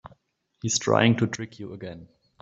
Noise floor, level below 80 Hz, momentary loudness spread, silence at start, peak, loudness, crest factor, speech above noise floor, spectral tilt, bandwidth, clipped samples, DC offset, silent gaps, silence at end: -68 dBFS; -62 dBFS; 19 LU; 0.05 s; -4 dBFS; -24 LUFS; 24 dB; 44 dB; -4.5 dB/octave; 8 kHz; under 0.1%; under 0.1%; none; 0.35 s